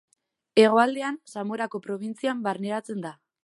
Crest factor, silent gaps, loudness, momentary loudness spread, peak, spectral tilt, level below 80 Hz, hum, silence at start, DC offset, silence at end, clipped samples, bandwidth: 22 dB; none; -26 LUFS; 15 LU; -4 dBFS; -5 dB/octave; -82 dBFS; none; 0.55 s; under 0.1%; 0.3 s; under 0.1%; 11.5 kHz